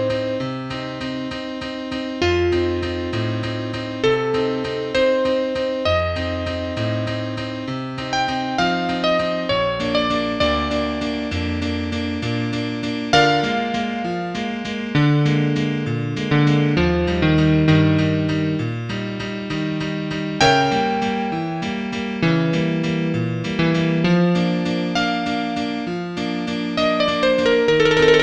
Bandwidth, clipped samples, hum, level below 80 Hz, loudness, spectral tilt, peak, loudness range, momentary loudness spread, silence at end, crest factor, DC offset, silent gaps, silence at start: 9 kHz; under 0.1%; none; -40 dBFS; -20 LUFS; -6 dB/octave; -2 dBFS; 4 LU; 10 LU; 0 s; 18 dB; under 0.1%; none; 0 s